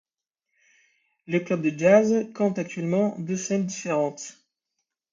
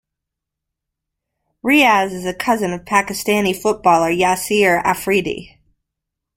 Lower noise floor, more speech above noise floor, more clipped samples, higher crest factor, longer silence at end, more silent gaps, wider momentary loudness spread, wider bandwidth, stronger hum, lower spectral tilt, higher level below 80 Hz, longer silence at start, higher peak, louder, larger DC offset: about the same, -84 dBFS vs -82 dBFS; second, 60 dB vs 65 dB; neither; about the same, 20 dB vs 18 dB; about the same, 0.8 s vs 0.9 s; neither; about the same, 11 LU vs 9 LU; second, 7.6 kHz vs 16.5 kHz; neither; first, -6 dB/octave vs -4 dB/octave; second, -72 dBFS vs -50 dBFS; second, 1.3 s vs 1.65 s; second, -6 dBFS vs -2 dBFS; second, -24 LUFS vs -16 LUFS; neither